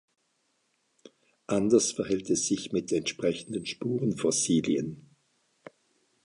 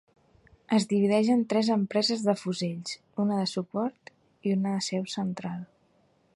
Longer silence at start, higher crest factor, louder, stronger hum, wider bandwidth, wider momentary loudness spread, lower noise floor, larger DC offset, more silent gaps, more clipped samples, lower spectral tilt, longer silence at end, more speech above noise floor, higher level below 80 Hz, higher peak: first, 1.5 s vs 0.7 s; about the same, 20 dB vs 18 dB; about the same, -28 LUFS vs -28 LUFS; neither; about the same, 11.5 kHz vs 11.5 kHz; second, 9 LU vs 12 LU; first, -74 dBFS vs -66 dBFS; neither; neither; neither; second, -4 dB/octave vs -5.5 dB/octave; first, 1.25 s vs 0.7 s; first, 46 dB vs 39 dB; first, -64 dBFS vs -70 dBFS; about the same, -10 dBFS vs -12 dBFS